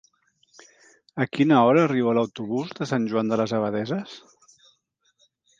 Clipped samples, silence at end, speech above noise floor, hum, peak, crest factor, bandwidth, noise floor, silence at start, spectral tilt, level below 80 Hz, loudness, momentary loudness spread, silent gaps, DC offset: under 0.1%; 1.4 s; 46 dB; none; -6 dBFS; 20 dB; 7.6 kHz; -69 dBFS; 1.15 s; -7 dB/octave; -70 dBFS; -23 LUFS; 13 LU; none; under 0.1%